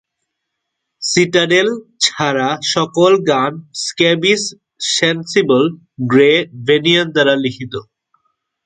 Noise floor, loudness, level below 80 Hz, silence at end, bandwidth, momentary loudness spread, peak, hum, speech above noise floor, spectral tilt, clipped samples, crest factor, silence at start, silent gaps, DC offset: -76 dBFS; -14 LUFS; -60 dBFS; 0.85 s; 9.6 kHz; 11 LU; 0 dBFS; none; 61 dB; -3.5 dB/octave; under 0.1%; 16 dB; 1 s; none; under 0.1%